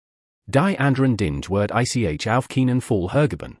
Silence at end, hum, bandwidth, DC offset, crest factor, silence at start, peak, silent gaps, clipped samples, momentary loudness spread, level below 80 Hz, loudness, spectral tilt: 0.1 s; none; 12 kHz; under 0.1%; 16 dB; 0.5 s; -4 dBFS; none; under 0.1%; 4 LU; -44 dBFS; -21 LUFS; -6.5 dB/octave